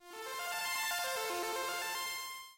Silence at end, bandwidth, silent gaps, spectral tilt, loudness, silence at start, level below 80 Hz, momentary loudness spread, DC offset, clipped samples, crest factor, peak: 0 s; 16 kHz; none; 0.5 dB/octave; -37 LUFS; 0 s; -78 dBFS; 6 LU; under 0.1%; under 0.1%; 14 dB; -26 dBFS